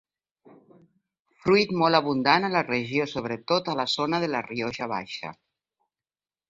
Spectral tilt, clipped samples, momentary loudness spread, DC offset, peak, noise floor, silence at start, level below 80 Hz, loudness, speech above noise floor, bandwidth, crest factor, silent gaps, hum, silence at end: -5.5 dB/octave; under 0.1%; 10 LU; under 0.1%; -6 dBFS; under -90 dBFS; 1.45 s; -64 dBFS; -25 LUFS; over 65 dB; 7.8 kHz; 22 dB; none; none; 1.15 s